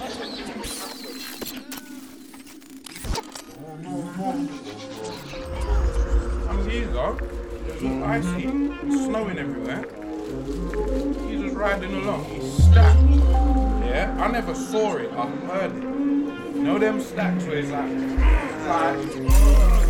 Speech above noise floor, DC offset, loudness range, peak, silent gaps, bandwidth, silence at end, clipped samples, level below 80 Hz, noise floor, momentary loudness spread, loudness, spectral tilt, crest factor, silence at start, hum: 23 dB; under 0.1%; 13 LU; -4 dBFS; none; 19.5 kHz; 0 s; under 0.1%; -24 dBFS; -43 dBFS; 16 LU; -24 LUFS; -6.5 dB/octave; 18 dB; 0 s; none